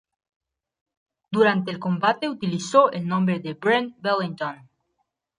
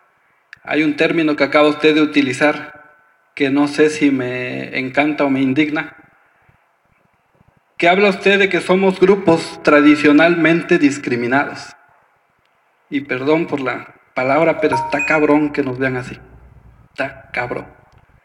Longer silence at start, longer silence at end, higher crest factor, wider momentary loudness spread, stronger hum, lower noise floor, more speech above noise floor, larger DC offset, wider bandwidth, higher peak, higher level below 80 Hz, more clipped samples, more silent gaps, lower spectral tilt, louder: first, 1.3 s vs 0.65 s; first, 0.85 s vs 0.55 s; first, 22 dB vs 16 dB; second, 10 LU vs 13 LU; neither; first, -76 dBFS vs -60 dBFS; first, 53 dB vs 45 dB; neither; about the same, 10.5 kHz vs 11.5 kHz; second, -4 dBFS vs 0 dBFS; second, -70 dBFS vs -54 dBFS; neither; neither; about the same, -6 dB/octave vs -5.5 dB/octave; second, -23 LUFS vs -15 LUFS